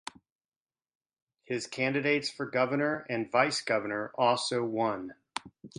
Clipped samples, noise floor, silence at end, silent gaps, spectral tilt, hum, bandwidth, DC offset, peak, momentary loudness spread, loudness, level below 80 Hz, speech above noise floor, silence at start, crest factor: under 0.1%; under -90 dBFS; 0.1 s; none; -4 dB/octave; none; 11.5 kHz; under 0.1%; -10 dBFS; 13 LU; -30 LUFS; -74 dBFS; over 60 dB; 1.5 s; 22 dB